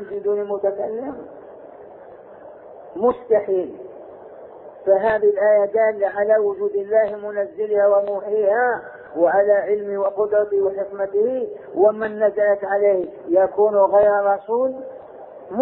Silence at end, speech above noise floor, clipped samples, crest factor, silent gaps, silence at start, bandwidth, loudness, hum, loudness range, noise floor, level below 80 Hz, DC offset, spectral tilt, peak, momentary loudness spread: 0 s; 23 dB; under 0.1%; 16 dB; none; 0 s; 4 kHz; -19 LUFS; none; 7 LU; -41 dBFS; -62 dBFS; under 0.1%; -10.5 dB/octave; -4 dBFS; 20 LU